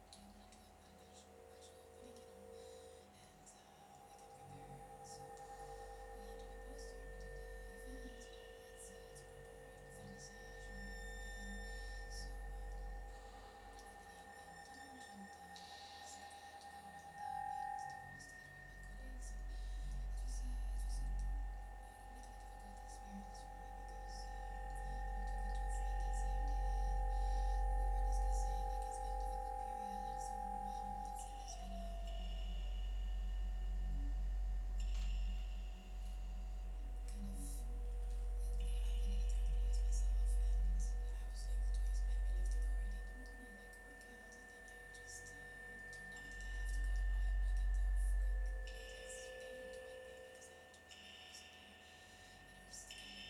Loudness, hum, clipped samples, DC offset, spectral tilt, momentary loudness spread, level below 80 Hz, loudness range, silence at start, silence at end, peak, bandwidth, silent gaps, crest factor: -47 LUFS; none; under 0.1%; under 0.1%; -4.5 dB/octave; 16 LU; -44 dBFS; 13 LU; 0 s; 0 s; -30 dBFS; 12 kHz; none; 14 dB